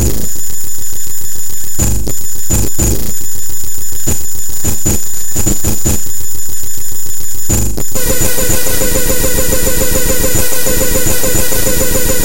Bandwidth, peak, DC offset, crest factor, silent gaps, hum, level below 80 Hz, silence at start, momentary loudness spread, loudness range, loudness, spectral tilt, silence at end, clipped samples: 17.5 kHz; 0 dBFS; 40%; 10 dB; none; none; -22 dBFS; 0 s; 7 LU; 4 LU; -14 LUFS; -3 dB/octave; 0 s; under 0.1%